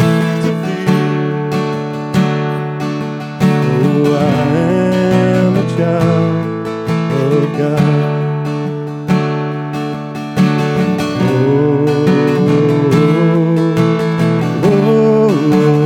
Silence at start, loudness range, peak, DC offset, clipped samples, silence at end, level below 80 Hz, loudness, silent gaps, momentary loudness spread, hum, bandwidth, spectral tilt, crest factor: 0 s; 4 LU; 0 dBFS; under 0.1%; under 0.1%; 0 s; -50 dBFS; -14 LUFS; none; 8 LU; none; 15.5 kHz; -8 dB/octave; 12 dB